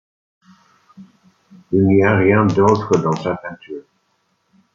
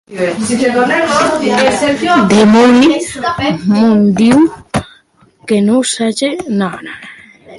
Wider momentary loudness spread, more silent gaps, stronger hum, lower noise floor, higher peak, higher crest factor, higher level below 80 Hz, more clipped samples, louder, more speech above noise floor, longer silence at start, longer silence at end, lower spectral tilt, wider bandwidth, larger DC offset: first, 19 LU vs 13 LU; neither; neither; first, -66 dBFS vs -48 dBFS; about the same, -2 dBFS vs 0 dBFS; first, 18 dB vs 12 dB; second, -56 dBFS vs -44 dBFS; neither; second, -16 LUFS vs -11 LUFS; first, 50 dB vs 37 dB; first, 1 s vs 0.1 s; first, 0.95 s vs 0 s; first, -7.5 dB/octave vs -5 dB/octave; second, 7.4 kHz vs 11.5 kHz; neither